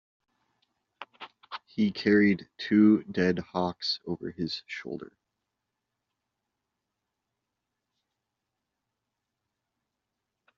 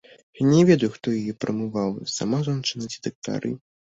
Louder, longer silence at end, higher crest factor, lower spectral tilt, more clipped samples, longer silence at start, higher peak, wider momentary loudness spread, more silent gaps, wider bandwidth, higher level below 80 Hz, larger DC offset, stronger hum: second, -27 LUFS vs -24 LUFS; first, 5.55 s vs 0.3 s; about the same, 20 dB vs 18 dB; second, -4.5 dB/octave vs -6 dB/octave; neither; first, 1 s vs 0.35 s; second, -10 dBFS vs -4 dBFS; first, 20 LU vs 13 LU; second, none vs 3.15-3.22 s; second, 7 kHz vs 8 kHz; second, -70 dBFS vs -60 dBFS; neither; neither